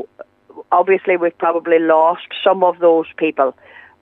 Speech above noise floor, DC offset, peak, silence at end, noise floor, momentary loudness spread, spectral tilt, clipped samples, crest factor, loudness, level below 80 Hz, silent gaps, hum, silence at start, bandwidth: 26 dB; under 0.1%; -2 dBFS; 0.5 s; -41 dBFS; 6 LU; -8 dB/octave; under 0.1%; 14 dB; -15 LUFS; -72 dBFS; none; none; 0 s; 4 kHz